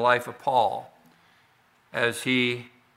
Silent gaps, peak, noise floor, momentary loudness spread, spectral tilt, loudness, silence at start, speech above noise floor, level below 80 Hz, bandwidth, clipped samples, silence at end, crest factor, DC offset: none; -6 dBFS; -62 dBFS; 12 LU; -4 dB/octave; -26 LUFS; 0 s; 38 dB; -74 dBFS; 16 kHz; under 0.1%; 0.3 s; 22 dB; under 0.1%